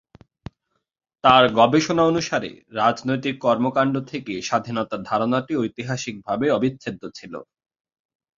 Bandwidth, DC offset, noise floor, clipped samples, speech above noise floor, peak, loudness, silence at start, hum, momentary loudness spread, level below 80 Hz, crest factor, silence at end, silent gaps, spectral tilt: 7.6 kHz; under 0.1%; -73 dBFS; under 0.1%; 52 dB; -2 dBFS; -21 LUFS; 1.25 s; none; 16 LU; -58 dBFS; 22 dB; 0.95 s; none; -5 dB/octave